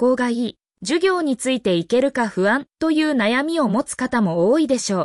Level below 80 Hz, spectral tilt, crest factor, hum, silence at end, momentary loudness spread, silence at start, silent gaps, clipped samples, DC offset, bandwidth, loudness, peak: -58 dBFS; -4.5 dB/octave; 12 dB; none; 0 s; 4 LU; 0 s; none; under 0.1%; under 0.1%; 12 kHz; -20 LUFS; -8 dBFS